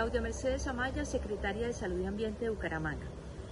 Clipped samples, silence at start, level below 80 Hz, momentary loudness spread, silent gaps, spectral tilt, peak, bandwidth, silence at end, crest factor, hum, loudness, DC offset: under 0.1%; 0 s; -44 dBFS; 4 LU; none; -5.5 dB/octave; -20 dBFS; 11.5 kHz; 0 s; 16 dB; none; -36 LUFS; under 0.1%